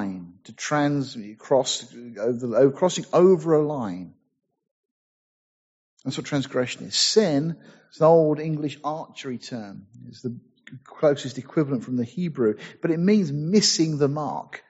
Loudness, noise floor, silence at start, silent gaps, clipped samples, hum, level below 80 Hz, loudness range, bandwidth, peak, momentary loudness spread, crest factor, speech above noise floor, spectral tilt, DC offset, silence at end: -23 LUFS; under -90 dBFS; 0 s; 4.71-5.97 s; under 0.1%; none; -68 dBFS; 7 LU; 8 kHz; -4 dBFS; 17 LU; 20 dB; over 67 dB; -5 dB/octave; under 0.1%; 0.1 s